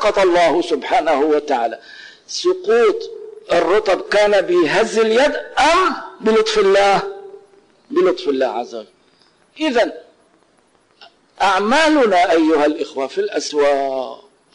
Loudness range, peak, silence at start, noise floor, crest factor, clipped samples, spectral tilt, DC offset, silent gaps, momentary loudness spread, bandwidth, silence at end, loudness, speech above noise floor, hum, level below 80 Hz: 6 LU; -10 dBFS; 0 s; -57 dBFS; 8 dB; under 0.1%; -3.5 dB/octave; under 0.1%; none; 11 LU; 11 kHz; 0.4 s; -16 LUFS; 41 dB; none; -50 dBFS